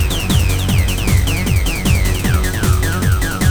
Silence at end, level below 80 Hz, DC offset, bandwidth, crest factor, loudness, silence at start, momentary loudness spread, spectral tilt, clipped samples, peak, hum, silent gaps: 0 s; -18 dBFS; 2%; over 20 kHz; 12 dB; -16 LUFS; 0 s; 1 LU; -4.5 dB/octave; under 0.1%; -2 dBFS; none; none